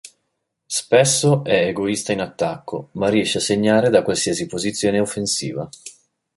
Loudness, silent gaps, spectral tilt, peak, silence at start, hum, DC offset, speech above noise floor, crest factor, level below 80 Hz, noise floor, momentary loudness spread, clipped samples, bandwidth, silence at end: -19 LUFS; none; -4 dB/octave; -2 dBFS; 0.05 s; none; under 0.1%; 56 dB; 18 dB; -54 dBFS; -75 dBFS; 14 LU; under 0.1%; 12 kHz; 0.45 s